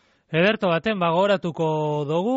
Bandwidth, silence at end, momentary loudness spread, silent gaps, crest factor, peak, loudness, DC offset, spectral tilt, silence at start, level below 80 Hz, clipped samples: 8 kHz; 0 s; 5 LU; none; 14 dB; -8 dBFS; -22 LUFS; under 0.1%; -4.5 dB/octave; 0.3 s; -62 dBFS; under 0.1%